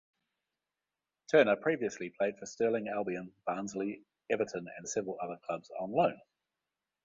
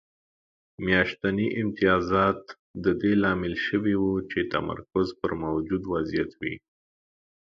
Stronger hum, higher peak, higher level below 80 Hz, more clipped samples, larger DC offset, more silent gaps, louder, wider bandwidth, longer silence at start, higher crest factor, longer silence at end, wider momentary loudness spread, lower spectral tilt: neither; second, -12 dBFS vs -8 dBFS; second, -78 dBFS vs -50 dBFS; neither; neither; second, none vs 2.59-2.74 s; second, -34 LUFS vs -26 LUFS; first, 8 kHz vs 7 kHz; first, 1.3 s vs 0.8 s; about the same, 22 dB vs 20 dB; second, 0.85 s vs 1 s; first, 12 LU vs 9 LU; second, -4.5 dB/octave vs -7.5 dB/octave